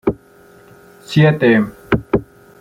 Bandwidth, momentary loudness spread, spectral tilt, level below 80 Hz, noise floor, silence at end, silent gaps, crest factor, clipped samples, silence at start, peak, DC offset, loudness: 9.6 kHz; 10 LU; -7.5 dB/octave; -40 dBFS; -46 dBFS; 0.35 s; none; 16 dB; under 0.1%; 0.05 s; -2 dBFS; under 0.1%; -16 LUFS